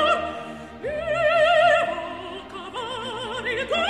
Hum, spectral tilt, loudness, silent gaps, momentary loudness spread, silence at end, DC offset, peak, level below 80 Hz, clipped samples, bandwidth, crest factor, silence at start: none; -3.5 dB/octave; -23 LUFS; none; 17 LU; 0 s; under 0.1%; -8 dBFS; -52 dBFS; under 0.1%; 11.5 kHz; 16 dB; 0 s